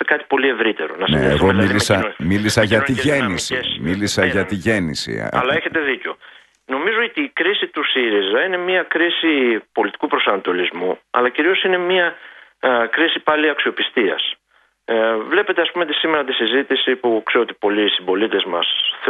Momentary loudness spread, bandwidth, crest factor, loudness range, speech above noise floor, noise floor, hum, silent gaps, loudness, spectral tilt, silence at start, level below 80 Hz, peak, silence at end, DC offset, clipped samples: 6 LU; 12 kHz; 18 dB; 3 LU; 42 dB; -60 dBFS; none; none; -17 LUFS; -4.5 dB/octave; 0 s; -46 dBFS; 0 dBFS; 0 s; under 0.1%; under 0.1%